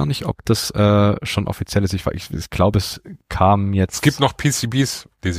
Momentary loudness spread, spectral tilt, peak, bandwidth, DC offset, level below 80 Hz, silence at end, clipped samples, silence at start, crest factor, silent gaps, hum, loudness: 10 LU; -5.5 dB/octave; -2 dBFS; 15.5 kHz; under 0.1%; -38 dBFS; 0 s; under 0.1%; 0 s; 18 dB; none; none; -19 LUFS